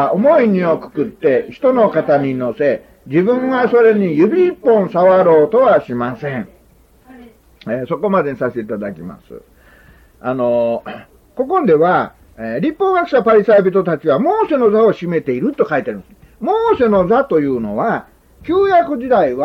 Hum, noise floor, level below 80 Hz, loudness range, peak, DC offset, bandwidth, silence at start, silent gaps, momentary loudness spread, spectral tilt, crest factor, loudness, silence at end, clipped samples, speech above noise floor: none; -49 dBFS; -50 dBFS; 9 LU; -2 dBFS; under 0.1%; 6 kHz; 0 s; none; 13 LU; -9 dB/octave; 12 dB; -14 LUFS; 0 s; under 0.1%; 35 dB